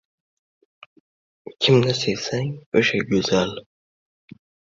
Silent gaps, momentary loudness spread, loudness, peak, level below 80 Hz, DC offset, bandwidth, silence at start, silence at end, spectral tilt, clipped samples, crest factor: 2.66-2.72 s; 10 LU; -21 LUFS; -4 dBFS; -56 dBFS; under 0.1%; 7.8 kHz; 1.45 s; 1.15 s; -5 dB/octave; under 0.1%; 20 dB